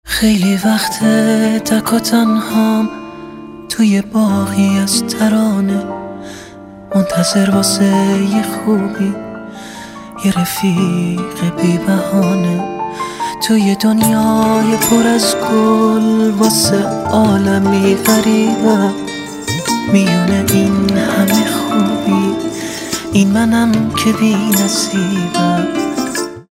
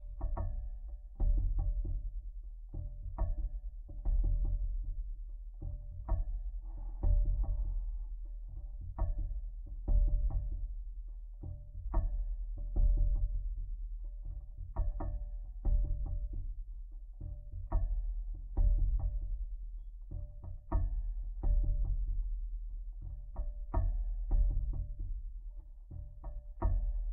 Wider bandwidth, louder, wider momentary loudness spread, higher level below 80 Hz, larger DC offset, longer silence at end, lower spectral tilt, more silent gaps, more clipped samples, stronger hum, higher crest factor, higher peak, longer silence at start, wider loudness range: first, 16 kHz vs 1.9 kHz; first, -13 LUFS vs -40 LUFS; second, 10 LU vs 13 LU; second, -46 dBFS vs -34 dBFS; neither; about the same, 0.1 s vs 0 s; second, -5 dB/octave vs -10 dB/octave; neither; neither; neither; about the same, 14 dB vs 16 dB; first, 0 dBFS vs -20 dBFS; about the same, 0.05 s vs 0 s; about the same, 4 LU vs 2 LU